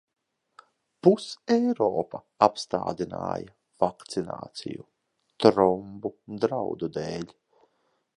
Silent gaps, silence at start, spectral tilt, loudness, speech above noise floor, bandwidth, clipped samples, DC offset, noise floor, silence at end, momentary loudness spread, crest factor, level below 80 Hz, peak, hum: none; 1.05 s; -6 dB/octave; -27 LUFS; 47 dB; 11.5 kHz; under 0.1%; under 0.1%; -73 dBFS; 0.9 s; 15 LU; 26 dB; -62 dBFS; -2 dBFS; none